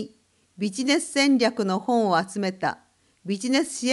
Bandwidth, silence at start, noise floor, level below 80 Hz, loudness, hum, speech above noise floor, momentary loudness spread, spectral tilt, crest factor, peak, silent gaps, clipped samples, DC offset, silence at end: 12 kHz; 0 s; -60 dBFS; -72 dBFS; -24 LUFS; none; 36 dB; 11 LU; -4 dB/octave; 18 dB; -8 dBFS; none; under 0.1%; under 0.1%; 0 s